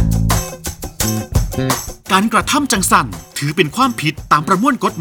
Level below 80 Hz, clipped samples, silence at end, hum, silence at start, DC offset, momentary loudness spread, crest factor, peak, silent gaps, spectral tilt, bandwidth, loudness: -28 dBFS; under 0.1%; 0 s; none; 0 s; under 0.1%; 9 LU; 16 dB; 0 dBFS; none; -4 dB/octave; over 20 kHz; -16 LUFS